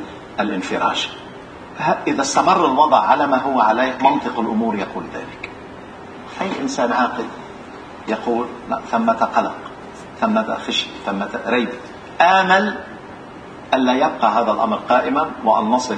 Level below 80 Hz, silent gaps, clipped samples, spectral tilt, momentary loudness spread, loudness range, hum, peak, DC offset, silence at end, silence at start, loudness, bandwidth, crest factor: -54 dBFS; none; under 0.1%; -4 dB/octave; 21 LU; 7 LU; none; 0 dBFS; under 0.1%; 0 s; 0 s; -18 LUFS; 10 kHz; 20 dB